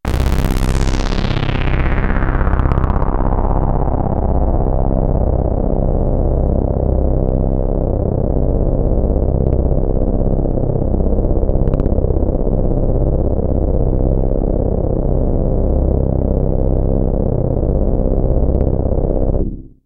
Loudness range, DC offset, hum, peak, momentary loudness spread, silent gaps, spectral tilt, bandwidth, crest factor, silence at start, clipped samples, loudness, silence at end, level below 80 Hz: 0 LU; under 0.1%; 50 Hz at -30 dBFS; 0 dBFS; 2 LU; none; -8.5 dB/octave; 8 kHz; 14 dB; 0.05 s; under 0.1%; -17 LUFS; 0.2 s; -16 dBFS